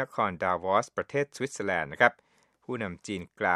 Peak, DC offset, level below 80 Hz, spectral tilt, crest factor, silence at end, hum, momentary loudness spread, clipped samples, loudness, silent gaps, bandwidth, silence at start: -4 dBFS; under 0.1%; -66 dBFS; -4.5 dB/octave; 26 dB; 0 s; none; 11 LU; under 0.1%; -29 LUFS; none; 12.5 kHz; 0 s